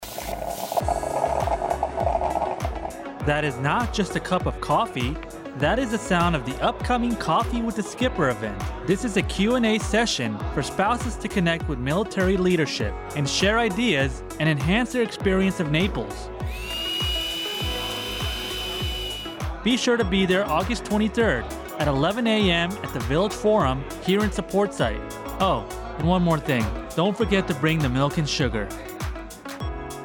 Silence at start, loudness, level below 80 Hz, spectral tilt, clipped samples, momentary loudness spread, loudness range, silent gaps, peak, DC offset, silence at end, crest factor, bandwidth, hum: 0 s; -24 LUFS; -36 dBFS; -5 dB/octave; under 0.1%; 9 LU; 3 LU; none; -10 dBFS; under 0.1%; 0 s; 14 dB; 19 kHz; none